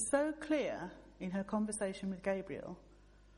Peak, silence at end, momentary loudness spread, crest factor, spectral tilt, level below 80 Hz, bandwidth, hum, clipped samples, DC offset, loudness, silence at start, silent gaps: -18 dBFS; 0.05 s; 12 LU; 20 dB; -5 dB/octave; -64 dBFS; 11 kHz; none; under 0.1%; under 0.1%; -39 LUFS; 0 s; none